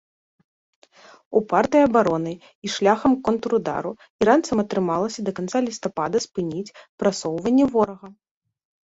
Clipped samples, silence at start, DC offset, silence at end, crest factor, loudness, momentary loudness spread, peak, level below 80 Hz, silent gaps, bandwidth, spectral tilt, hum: under 0.1%; 1.3 s; under 0.1%; 0.7 s; 18 dB; -22 LUFS; 11 LU; -4 dBFS; -58 dBFS; 2.55-2.62 s, 4.10-4.19 s, 6.89-6.98 s; 8 kHz; -5.5 dB/octave; none